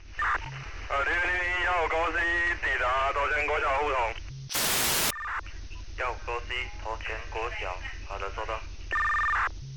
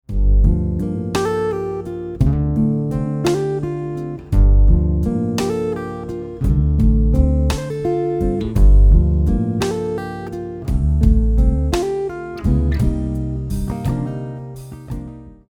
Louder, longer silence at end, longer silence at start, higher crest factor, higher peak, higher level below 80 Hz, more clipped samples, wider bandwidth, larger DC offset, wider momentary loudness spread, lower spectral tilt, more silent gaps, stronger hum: second, -28 LUFS vs -19 LUFS; second, 0 s vs 0.15 s; about the same, 0 s vs 0.1 s; about the same, 16 dB vs 16 dB; second, -14 dBFS vs -2 dBFS; second, -42 dBFS vs -18 dBFS; neither; first, 19 kHz vs 11.5 kHz; first, 0.1% vs under 0.1%; about the same, 11 LU vs 12 LU; second, -2 dB/octave vs -8 dB/octave; neither; neither